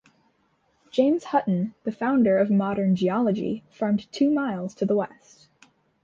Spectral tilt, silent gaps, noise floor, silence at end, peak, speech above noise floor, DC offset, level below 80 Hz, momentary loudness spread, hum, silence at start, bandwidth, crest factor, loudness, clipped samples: -8 dB/octave; none; -67 dBFS; 0.95 s; -8 dBFS; 44 dB; under 0.1%; -64 dBFS; 9 LU; none; 0.95 s; 7.4 kHz; 18 dB; -24 LUFS; under 0.1%